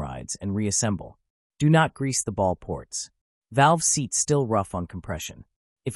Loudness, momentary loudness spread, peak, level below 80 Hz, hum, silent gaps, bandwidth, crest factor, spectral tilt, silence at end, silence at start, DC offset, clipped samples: -24 LUFS; 14 LU; -6 dBFS; -52 dBFS; none; 1.30-1.50 s, 3.21-3.42 s, 5.56-5.76 s; 13.5 kHz; 18 dB; -4.5 dB/octave; 0 s; 0 s; under 0.1%; under 0.1%